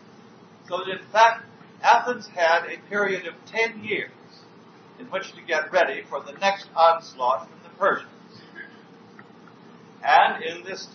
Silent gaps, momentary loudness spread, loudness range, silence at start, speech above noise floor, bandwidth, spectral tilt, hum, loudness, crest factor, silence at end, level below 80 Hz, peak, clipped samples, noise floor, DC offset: none; 16 LU; 5 LU; 0.7 s; 26 dB; 6.6 kHz; -3 dB/octave; none; -23 LUFS; 22 dB; 0.1 s; -88 dBFS; -4 dBFS; under 0.1%; -49 dBFS; under 0.1%